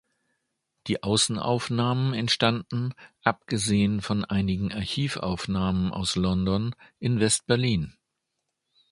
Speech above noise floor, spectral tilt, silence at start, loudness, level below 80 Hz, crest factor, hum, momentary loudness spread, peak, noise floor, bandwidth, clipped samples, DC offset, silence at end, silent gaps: 55 dB; -4.5 dB/octave; 0.85 s; -26 LUFS; -48 dBFS; 24 dB; none; 8 LU; -2 dBFS; -81 dBFS; 11.5 kHz; under 0.1%; under 0.1%; 1 s; none